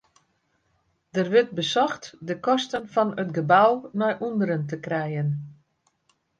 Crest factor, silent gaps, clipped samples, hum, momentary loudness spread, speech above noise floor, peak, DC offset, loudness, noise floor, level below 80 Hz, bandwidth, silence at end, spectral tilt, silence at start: 20 dB; none; under 0.1%; none; 11 LU; 47 dB; -6 dBFS; under 0.1%; -24 LUFS; -70 dBFS; -70 dBFS; 9.2 kHz; 0.85 s; -6 dB/octave; 1.15 s